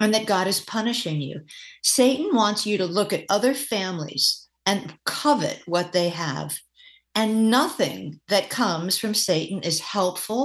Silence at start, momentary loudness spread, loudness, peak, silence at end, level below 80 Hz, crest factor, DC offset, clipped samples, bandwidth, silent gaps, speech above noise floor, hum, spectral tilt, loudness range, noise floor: 0 s; 9 LU; -23 LUFS; -6 dBFS; 0 s; -70 dBFS; 18 dB; under 0.1%; under 0.1%; 13 kHz; none; 21 dB; none; -3.5 dB/octave; 2 LU; -44 dBFS